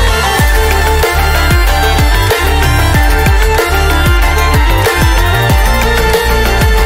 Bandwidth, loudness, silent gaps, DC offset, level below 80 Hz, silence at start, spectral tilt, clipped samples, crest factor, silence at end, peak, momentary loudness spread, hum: 16.5 kHz; -10 LUFS; none; under 0.1%; -12 dBFS; 0 s; -4.5 dB/octave; under 0.1%; 8 dB; 0 s; 0 dBFS; 1 LU; none